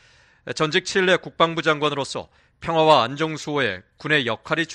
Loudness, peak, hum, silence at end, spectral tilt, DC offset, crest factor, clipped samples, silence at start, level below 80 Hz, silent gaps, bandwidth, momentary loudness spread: -21 LUFS; -2 dBFS; none; 0 s; -4 dB/octave; under 0.1%; 20 dB; under 0.1%; 0.45 s; -58 dBFS; none; 11 kHz; 15 LU